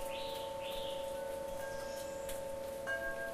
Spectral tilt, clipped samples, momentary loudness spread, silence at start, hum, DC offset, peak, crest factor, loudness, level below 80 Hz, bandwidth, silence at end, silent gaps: -2.5 dB/octave; under 0.1%; 4 LU; 0 s; none; under 0.1%; -28 dBFS; 12 dB; -41 LUFS; -58 dBFS; 15.5 kHz; 0 s; none